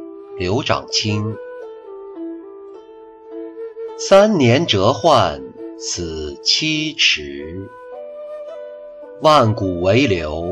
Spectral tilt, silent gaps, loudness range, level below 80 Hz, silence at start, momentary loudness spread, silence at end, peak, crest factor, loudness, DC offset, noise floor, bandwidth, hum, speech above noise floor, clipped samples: -4.5 dB/octave; none; 8 LU; -46 dBFS; 0 s; 21 LU; 0 s; -2 dBFS; 16 dB; -16 LUFS; under 0.1%; -40 dBFS; 11 kHz; none; 24 dB; under 0.1%